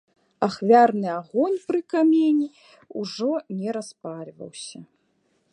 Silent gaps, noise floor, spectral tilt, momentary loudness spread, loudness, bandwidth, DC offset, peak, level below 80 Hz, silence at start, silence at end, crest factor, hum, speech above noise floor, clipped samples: none; -68 dBFS; -6 dB/octave; 20 LU; -22 LUFS; 10.5 kHz; under 0.1%; -4 dBFS; -74 dBFS; 0.4 s; 0.7 s; 20 dB; none; 46 dB; under 0.1%